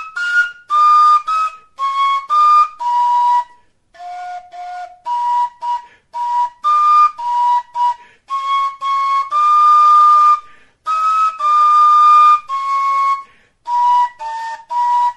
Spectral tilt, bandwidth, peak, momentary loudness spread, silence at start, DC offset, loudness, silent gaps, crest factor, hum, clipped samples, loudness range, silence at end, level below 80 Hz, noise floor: 1.5 dB/octave; 11.5 kHz; -2 dBFS; 19 LU; 0 s; under 0.1%; -13 LUFS; none; 12 dB; none; under 0.1%; 8 LU; 0.05 s; -64 dBFS; -49 dBFS